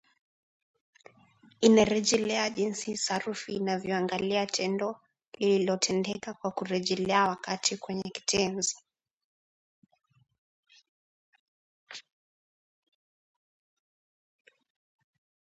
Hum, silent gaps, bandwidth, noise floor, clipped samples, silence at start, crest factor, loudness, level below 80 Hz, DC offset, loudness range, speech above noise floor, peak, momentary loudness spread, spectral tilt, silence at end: none; 5.28-5.32 s, 9.13-9.82 s, 10.38-10.63 s, 10.89-11.33 s, 11.40-11.87 s; 11 kHz; -61 dBFS; under 0.1%; 1.6 s; 24 dB; -28 LUFS; -66 dBFS; under 0.1%; 7 LU; 33 dB; -8 dBFS; 11 LU; -3.5 dB/octave; 3.5 s